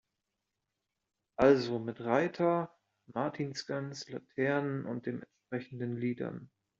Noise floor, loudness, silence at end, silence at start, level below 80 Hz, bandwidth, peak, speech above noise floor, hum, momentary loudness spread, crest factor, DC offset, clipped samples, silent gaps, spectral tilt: -87 dBFS; -33 LUFS; 0.35 s; 1.4 s; -68 dBFS; 7.6 kHz; -12 dBFS; 54 dB; none; 15 LU; 24 dB; under 0.1%; under 0.1%; none; -5.5 dB/octave